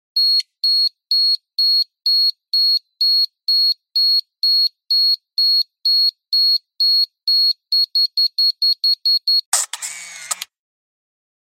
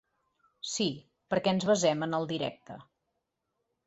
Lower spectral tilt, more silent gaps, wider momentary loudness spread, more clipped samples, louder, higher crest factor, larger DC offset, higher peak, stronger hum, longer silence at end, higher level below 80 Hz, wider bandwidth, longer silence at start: second, 6.5 dB/octave vs -4.5 dB/octave; first, 9.46-9.52 s vs none; second, 4 LU vs 21 LU; neither; first, -14 LUFS vs -30 LUFS; about the same, 16 dB vs 18 dB; neither; first, -2 dBFS vs -14 dBFS; neither; about the same, 1 s vs 1.05 s; second, -90 dBFS vs -72 dBFS; first, 16 kHz vs 8.2 kHz; second, 0.15 s vs 0.65 s